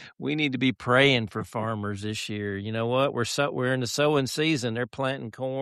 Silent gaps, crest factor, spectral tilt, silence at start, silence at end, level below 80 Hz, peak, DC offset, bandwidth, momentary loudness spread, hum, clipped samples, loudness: none; 18 dB; -5 dB/octave; 0 s; 0 s; -62 dBFS; -8 dBFS; under 0.1%; 13.5 kHz; 10 LU; none; under 0.1%; -26 LUFS